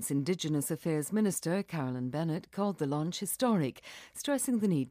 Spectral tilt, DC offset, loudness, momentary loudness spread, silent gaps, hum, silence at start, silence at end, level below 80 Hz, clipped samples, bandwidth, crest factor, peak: -5.5 dB/octave; under 0.1%; -32 LUFS; 6 LU; none; none; 0 s; 0 s; -72 dBFS; under 0.1%; 15.5 kHz; 14 dB; -18 dBFS